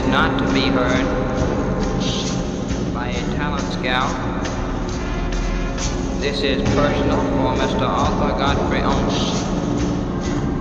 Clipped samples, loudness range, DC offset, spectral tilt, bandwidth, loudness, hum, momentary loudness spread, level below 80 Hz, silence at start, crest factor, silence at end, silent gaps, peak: under 0.1%; 4 LU; under 0.1%; -5.5 dB/octave; 8.4 kHz; -20 LUFS; none; 6 LU; -28 dBFS; 0 s; 14 dB; 0 s; none; -4 dBFS